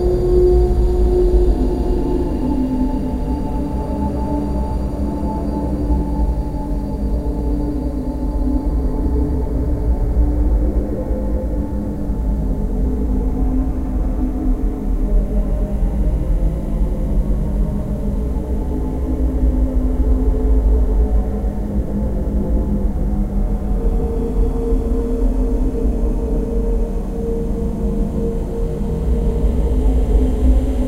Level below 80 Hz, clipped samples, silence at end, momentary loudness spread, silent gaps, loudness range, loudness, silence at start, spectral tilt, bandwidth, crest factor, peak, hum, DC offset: -18 dBFS; under 0.1%; 0 s; 6 LU; none; 2 LU; -20 LUFS; 0 s; -9.5 dB/octave; 5 kHz; 14 dB; -2 dBFS; none; under 0.1%